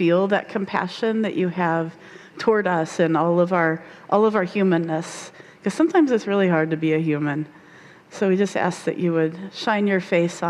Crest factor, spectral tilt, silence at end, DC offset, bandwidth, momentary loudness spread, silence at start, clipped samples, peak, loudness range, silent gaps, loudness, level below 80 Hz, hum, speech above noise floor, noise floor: 16 dB; -6.5 dB/octave; 0 s; under 0.1%; 11.5 kHz; 10 LU; 0 s; under 0.1%; -6 dBFS; 2 LU; none; -21 LUFS; -70 dBFS; none; 26 dB; -47 dBFS